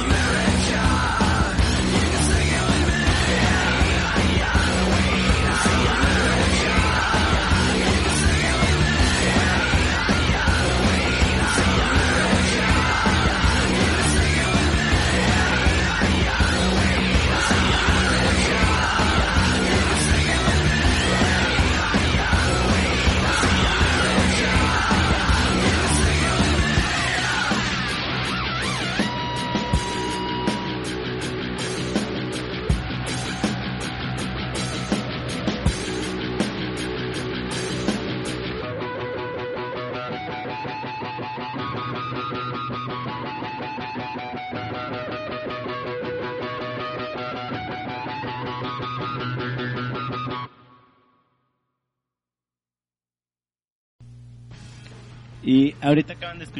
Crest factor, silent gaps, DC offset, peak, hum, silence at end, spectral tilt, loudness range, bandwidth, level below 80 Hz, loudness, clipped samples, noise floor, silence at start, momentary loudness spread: 14 dB; 53.72-53.99 s; under 0.1%; -8 dBFS; none; 0 s; -4.5 dB/octave; 10 LU; 11.5 kHz; -28 dBFS; -21 LUFS; under 0.1%; under -90 dBFS; 0 s; 11 LU